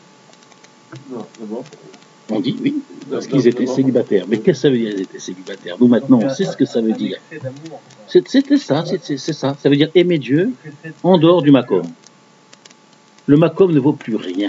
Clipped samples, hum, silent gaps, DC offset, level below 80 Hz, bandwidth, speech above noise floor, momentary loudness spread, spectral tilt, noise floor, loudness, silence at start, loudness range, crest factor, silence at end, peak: under 0.1%; none; none; under 0.1%; -64 dBFS; 7.8 kHz; 32 dB; 18 LU; -7 dB/octave; -49 dBFS; -16 LUFS; 0.9 s; 4 LU; 16 dB; 0 s; 0 dBFS